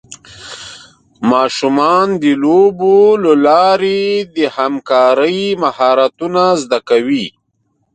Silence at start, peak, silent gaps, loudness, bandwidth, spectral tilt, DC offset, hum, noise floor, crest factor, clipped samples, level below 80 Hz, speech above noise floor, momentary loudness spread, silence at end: 0.1 s; 0 dBFS; none; -12 LUFS; 9.2 kHz; -5 dB/octave; under 0.1%; none; -63 dBFS; 12 dB; under 0.1%; -58 dBFS; 52 dB; 10 LU; 0.65 s